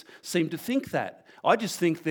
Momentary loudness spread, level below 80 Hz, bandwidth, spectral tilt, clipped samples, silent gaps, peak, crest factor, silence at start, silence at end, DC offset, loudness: 7 LU; -70 dBFS; over 20 kHz; -5 dB/octave; under 0.1%; none; -8 dBFS; 20 dB; 0.1 s; 0 s; under 0.1%; -28 LUFS